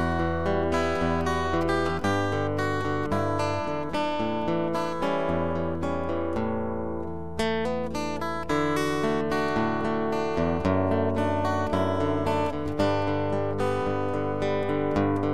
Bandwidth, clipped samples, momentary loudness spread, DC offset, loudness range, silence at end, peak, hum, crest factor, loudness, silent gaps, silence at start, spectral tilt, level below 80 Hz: 14 kHz; under 0.1%; 4 LU; 1%; 3 LU; 0 s; -10 dBFS; none; 16 dB; -27 LUFS; none; 0 s; -6.5 dB/octave; -46 dBFS